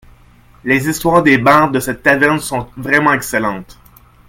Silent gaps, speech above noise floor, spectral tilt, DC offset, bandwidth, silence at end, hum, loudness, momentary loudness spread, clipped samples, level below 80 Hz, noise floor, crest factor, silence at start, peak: none; 32 dB; -5 dB/octave; under 0.1%; 17 kHz; 0.65 s; 60 Hz at -40 dBFS; -13 LUFS; 12 LU; under 0.1%; -42 dBFS; -45 dBFS; 14 dB; 0.65 s; 0 dBFS